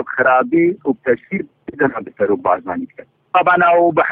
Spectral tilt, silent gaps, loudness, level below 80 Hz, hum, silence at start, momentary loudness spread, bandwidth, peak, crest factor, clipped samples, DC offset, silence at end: -9.5 dB/octave; none; -16 LUFS; -58 dBFS; none; 0 s; 14 LU; 3.9 kHz; 0 dBFS; 16 dB; under 0.1%; under 0.1%; 0 s